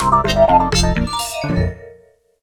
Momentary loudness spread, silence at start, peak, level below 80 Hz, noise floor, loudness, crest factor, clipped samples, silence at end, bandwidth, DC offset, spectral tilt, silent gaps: 9 LU; 0 s; 0 dBFS; -26 dBFS; -49 dBFS; -16 LUFS; 16 dB; under 0.1%; 0.5 s; 19.5 kHz; under 0.1%; -4.5 dB/octave; none